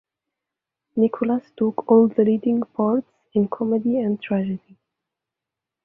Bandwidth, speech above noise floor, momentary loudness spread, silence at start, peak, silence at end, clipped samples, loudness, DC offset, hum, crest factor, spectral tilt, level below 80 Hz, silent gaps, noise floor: 3.6 kHz; 66 dB; 9 LU; 0.95 s; -4 dBFS; 1.25 s; under 0.1%; -21 LUFS; under 0.1%; none; 18 dB; -11.5 dB/octave; -66 dBFS; none; -86 dBFS